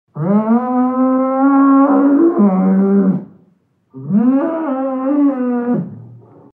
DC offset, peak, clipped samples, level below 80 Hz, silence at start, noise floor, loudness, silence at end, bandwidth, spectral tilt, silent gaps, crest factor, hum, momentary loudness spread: under 0.1%; -2 dBFS; under 0.1%; -70 dBFS; 0.15 s; -56 dBFS; -14 LUFS; 0.4 s; 2.9 kHz; -12.5 dB/octave; none; 12 dB; none; 9 LU